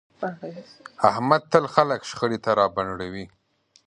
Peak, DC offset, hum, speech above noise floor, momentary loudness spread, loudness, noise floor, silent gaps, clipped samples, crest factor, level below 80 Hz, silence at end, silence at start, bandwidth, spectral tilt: 0 dBFS; under 0.1%; none; 39 dB; 19 LU; -23 LUFS; -62 dBFS; none; under 0.1%; 24 dB; -58 dBFS; 0.6 s; 0.2 s; 10.5 kHz; -5.5 dB/octave